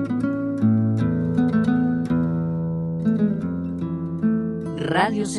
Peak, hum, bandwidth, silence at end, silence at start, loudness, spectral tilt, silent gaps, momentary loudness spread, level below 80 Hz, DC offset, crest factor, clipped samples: -6 dBFS; none; 11 kHz; 0 s; 0 s; -22 LUFS; -7.5 dB/octave; none; 7 LU; -48 dBFS; under 0.1%; 14 dB; under 0.1%